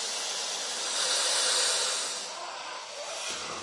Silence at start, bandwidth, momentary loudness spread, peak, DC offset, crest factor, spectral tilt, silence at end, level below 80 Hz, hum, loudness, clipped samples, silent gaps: 0 s; 12 kHz; 13 LU; -12 dBFS; under 0.1%; 18 dB; 2 dB/octave; 0 s; -80 dBFS; none; -28 LUFS; under 0.1%; none